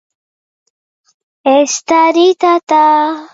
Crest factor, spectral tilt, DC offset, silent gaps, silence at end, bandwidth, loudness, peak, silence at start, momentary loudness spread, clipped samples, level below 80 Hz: 12 dB; -1.5 dB/octave; under 0.1%; 2.63-2.67 s; 0.05 s; 8 kHz; -11 LUFS; 0 dBFS; 1.45 s; 4 LU; under 0.1%; -64 dBFS